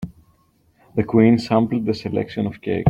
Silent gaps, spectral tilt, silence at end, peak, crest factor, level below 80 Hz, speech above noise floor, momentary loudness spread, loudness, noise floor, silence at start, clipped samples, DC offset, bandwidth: none; -8.5 dB/octave; 0 s; -2 dBFS; 18 dB; -52 dBFS; 41 dB; 11 LU; -20 LUFS; -60 dBFS; 0 s; under 0.1%; under 0.1%; 8.4 kHz